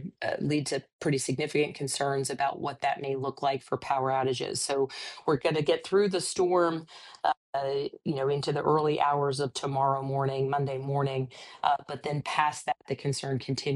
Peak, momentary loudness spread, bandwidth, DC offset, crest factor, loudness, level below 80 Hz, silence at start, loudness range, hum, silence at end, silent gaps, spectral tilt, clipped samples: -10 dBFS; 7 LU; 13.5 kHz; under 0.1%; 18 dB; -29 LUFS; -68 dBFS; 0 s; 2 LU; none; 0 s; 0.93-0.99 s, 7.37-7.53 s; -5 dB/octave; under 0.1%